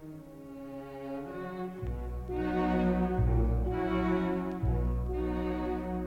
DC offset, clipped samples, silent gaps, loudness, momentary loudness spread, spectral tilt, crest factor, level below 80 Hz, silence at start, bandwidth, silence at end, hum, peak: under 0.1%; under 0.1%; none; -32 LUFS; 14 LU; -9 dB/octave; 14 dB; -36 dBFS; 0 s; 5.8 kHz; 0 s; none; -18 dBFS